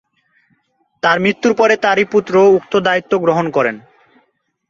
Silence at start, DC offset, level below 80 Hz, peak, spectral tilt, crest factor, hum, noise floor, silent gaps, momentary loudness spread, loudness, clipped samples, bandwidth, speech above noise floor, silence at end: 1.05 s; under 0.1%; -58 dBFS; 0 dBFS; -5.5 dB/octave; 14 dB; none; -62 dBFS; none; 6 LU; -14 LUFS; under 0.1%; 7.4 kHz; 49 dB; 0.9 s